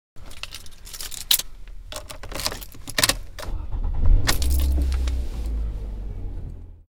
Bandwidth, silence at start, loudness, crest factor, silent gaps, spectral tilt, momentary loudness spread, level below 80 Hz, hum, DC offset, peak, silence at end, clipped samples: 18 kHz; 0.15 s; -26 LUFS; 24 dB; none; -2.5 dB/octave; 18 LU; -26 dBFS; none; under 0.1%; 0 dBFS; 0.1 s; under 0.1%